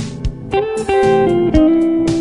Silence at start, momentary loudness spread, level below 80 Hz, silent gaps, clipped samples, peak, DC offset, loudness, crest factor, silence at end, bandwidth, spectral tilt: 0 s; 9 LU; -28 dBFS; none; under 0.1%; 0 dBFS; under 0.1%; -14 LUFS; 14 dB; 0 s; 11 kHz; -7 dB/octave